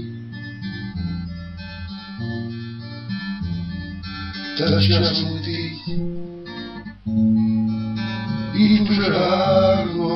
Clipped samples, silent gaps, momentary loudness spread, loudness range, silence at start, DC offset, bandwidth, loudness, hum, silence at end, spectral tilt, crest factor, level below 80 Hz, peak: under 0.1%; none; 17 LU; 11 LU; 0 s; under 0.1%; 6.2 kHz; -21 LUFS; none; 0 s; -8 dB/octave; 18 dB; -44 dBFS; -4 dBFS